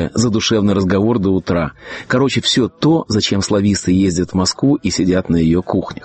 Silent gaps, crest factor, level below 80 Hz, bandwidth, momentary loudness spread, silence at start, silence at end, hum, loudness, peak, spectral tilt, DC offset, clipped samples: none; 12 dB; -40 dBFS; 8.8 kHz; 4 LU; 0 s; 0 s; none; -15 LUFS; -2 dBFS; -5 dB/octave; under 0.1%; under 0.1%